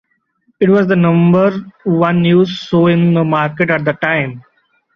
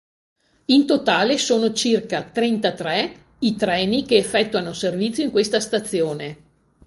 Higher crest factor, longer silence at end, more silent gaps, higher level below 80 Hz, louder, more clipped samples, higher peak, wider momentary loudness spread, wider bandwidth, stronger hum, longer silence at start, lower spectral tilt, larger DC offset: second, 12 dB vs 18 dB; about the same, 0.55 s vs 0.5 s; neither; about the same, -52 dBFS vs -56 dBFS; first, -13 LUFS vs -20 LUFS; neither; about the same, 0 dBFS vs -2 dBFS; about the same, 6 LU vs 7 LU; second, 6.4 kHz vs 12 kHz; neither; about the same, 0.6 s vs 0.7 s; first, -8.5 dB/octave vs -4 dB/octave; neither